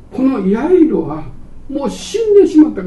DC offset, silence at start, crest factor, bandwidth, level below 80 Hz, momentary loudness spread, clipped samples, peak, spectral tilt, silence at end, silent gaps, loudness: under 0.1%; 0.1 s; 12 dB; 11.5 kHz; -36 dBFS; 15 LU; under 0.1%; 0 dBFS; -7 dB/octave; 0 s; none; -13 LUFS